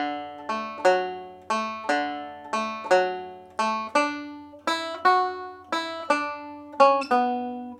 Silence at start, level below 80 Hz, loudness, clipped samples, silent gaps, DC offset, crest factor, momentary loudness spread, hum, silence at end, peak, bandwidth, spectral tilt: 0 s; -76 dBFS; -25 LUFS; under 0.1%; none; under 0.1%; 22 dB; 15 LU; none; 0 s; -4 dBFS; 14 kHz; -3 dB/octave